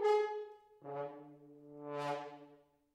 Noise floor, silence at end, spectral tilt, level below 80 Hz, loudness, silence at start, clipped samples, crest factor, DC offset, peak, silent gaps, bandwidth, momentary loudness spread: -65 dBFS; 0.4 s; -5.5 dB/octave; -88 dBFS; -41 LUFS; 0 s; under 0.1%; 18 dB; under 0.1%; -22 dBFS; none; 10 kHz; 22 LU